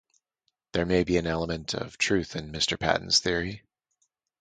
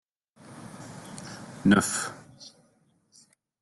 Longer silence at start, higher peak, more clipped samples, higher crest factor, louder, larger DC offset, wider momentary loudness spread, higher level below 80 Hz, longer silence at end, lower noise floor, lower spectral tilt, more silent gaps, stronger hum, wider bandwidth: first, 0.75 s vs 0.5 s; about the same, -6 dBFS vs -8 dBFS; neither; about the same, 22 dB vs 22 dB; about the same, -27 LUFS vs -25 LUFS; neither; second, 10 LU vs 26 LU; first, -48 dBFS vs -64 dBFS; second, 0.85 s vs 1.15 s; first, -79 dBFS vs -66 dBFS; about the same, -3.5 dB/octave vs -4.5 dB/octave; neither; neither; second, 9.6 kHz vs 12.5 kHz